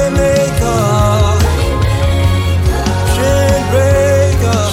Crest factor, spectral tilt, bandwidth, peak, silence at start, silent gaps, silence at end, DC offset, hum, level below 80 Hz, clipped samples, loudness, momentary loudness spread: 10 dB; -5.5 dB/octave; 16 kHz; 0 dBFS; 0 s; none; 0 s; under 0.1%; none; -18 dBFS; under 0.1%; -12 LUFS; 3 LU